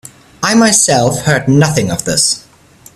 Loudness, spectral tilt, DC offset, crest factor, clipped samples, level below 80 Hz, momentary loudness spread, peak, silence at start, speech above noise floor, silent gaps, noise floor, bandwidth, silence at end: -11 LUFS; -3.5 dB/octave; under 0.1%; 12 dB; under 0.1%; -42 dBFS; 7 LU; 0 dBFS; 0.4 s; 31 dB; none; -42 dBFS; 15 kHz; 0.55 s